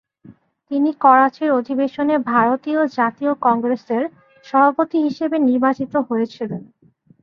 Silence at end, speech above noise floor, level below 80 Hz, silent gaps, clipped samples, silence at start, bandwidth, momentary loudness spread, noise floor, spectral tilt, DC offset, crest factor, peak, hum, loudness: 0.6 s; 30 dB; -66 dBFS; none; under 0.1%; 0.3 s; 6.6 kHz; 9 LU; -47 dBFS; -7.5 dB/octave; under 0.1%; 16 dB; -2 dBFS; none; -18 LUFS